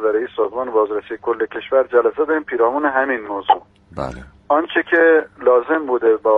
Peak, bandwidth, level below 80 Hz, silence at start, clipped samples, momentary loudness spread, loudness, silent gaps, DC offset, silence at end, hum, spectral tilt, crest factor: 0 dBFS; 4.8 kHz; -50 dBFS; 0 s; under 0.1%; 10 LU; -17 LUFS; none; under 0.1%; 0 s; none; -6.5 dB/octave; 16 dB